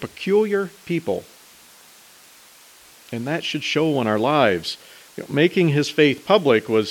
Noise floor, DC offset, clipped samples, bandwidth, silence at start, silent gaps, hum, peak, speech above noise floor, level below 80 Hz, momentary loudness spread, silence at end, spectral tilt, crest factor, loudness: -49 dBFS; under 0.1%; under 0.1%; 18 kHz; 0 s; none; none; -2 dBFS; 29 dB; -64 dBFS; 13 LU; 0 s; -5.5 dB/octave; 20 dB; -20 LUFS